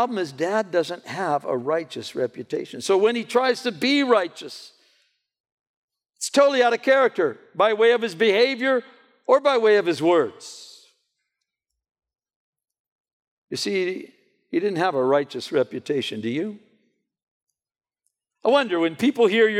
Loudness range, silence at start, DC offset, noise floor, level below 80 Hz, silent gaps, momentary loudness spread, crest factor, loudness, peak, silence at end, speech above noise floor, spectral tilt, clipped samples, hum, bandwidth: 10 LU; 0 s; under 0.1%; -82 dBFS; -78 dBFS; 5.40-5.44 s, 5.52-5.88 s, 12.36-12.53 s, 12.80-13.05 s, 13.13-13.20 s, 13.27-13.47 s, 17.23-17.47 s; 13 LU; 18 dB; -22 LUFS; -4 dBFS; 0 s; 61 dB; -4 dB/octave; under 0.1%; none; 14.5 kHz